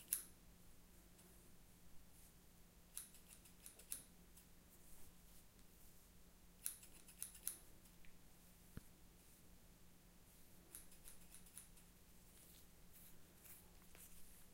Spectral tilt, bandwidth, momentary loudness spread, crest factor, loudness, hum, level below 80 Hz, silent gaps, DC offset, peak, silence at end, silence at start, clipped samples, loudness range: -2 dB/octave; 16 kHz; 17 LU; 42 dB; -58 LUFS; none; -70 dBFS; none; under 0.1%; -18 dBFS; 0 s; 0 s; under 0.1%; 8 LU